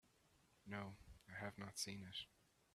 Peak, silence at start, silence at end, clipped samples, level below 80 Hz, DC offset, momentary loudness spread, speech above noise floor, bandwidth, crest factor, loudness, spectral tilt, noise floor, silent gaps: -32 dBFS; 0.05 s; 0.45 s; under 0.1%; -74 dBFS; under 0.1%; 12 LU; 25 dB; 14 kHz; 22 dB; -52 LUFS; -3 dB/octave; -77 dBFS; none